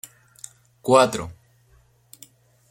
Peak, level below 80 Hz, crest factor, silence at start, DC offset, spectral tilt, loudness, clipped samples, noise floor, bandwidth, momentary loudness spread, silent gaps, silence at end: -2 dBFS; -60 dBFS; 24 dB; 0.85 s; under 0.1%; -4.5 dB/octave; -20 LUFS; under 0.1%; -58 dBFS; 16.5 kHz; 25 LU; none; 1.4 s